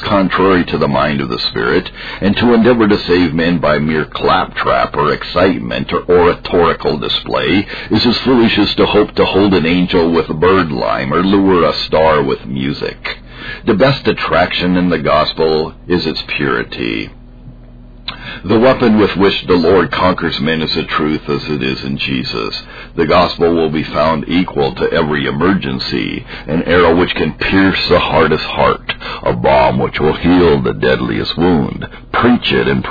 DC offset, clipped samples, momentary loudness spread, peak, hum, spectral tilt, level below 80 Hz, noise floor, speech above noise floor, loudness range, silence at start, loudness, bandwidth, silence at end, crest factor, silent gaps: 0.3%; under 0.1%; 8 LU; 0 dBFS; none; -7.5 dB/octave; -34 dBFS; -35 dBFS; 22 dB; 3 LU; 0 s; -13 LUFS; 5 kHz; 0 s; 12 dB; none